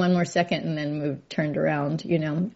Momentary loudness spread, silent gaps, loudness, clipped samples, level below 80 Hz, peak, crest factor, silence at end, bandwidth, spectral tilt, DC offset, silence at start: 6 LU; none; -26 LUFS; under 0.1%; -64 dBFS; -8 dBFS; 16 dB; 0.05 s; 8 kHz; -6 dB/octave; under 0.1%; 0 s